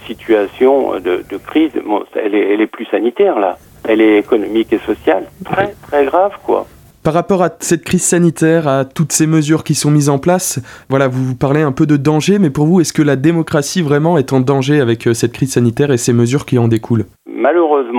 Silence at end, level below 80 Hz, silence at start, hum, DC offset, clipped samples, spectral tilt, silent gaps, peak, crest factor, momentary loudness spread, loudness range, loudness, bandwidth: 0 s; -46 dBFS; 0 s; none; under 0.1%; under 0.1%; -5.5 dB/octave; none; 0 dBFS; 12 dB; 6 LU; 2 LU; -13 LUFS; 17.5 kHz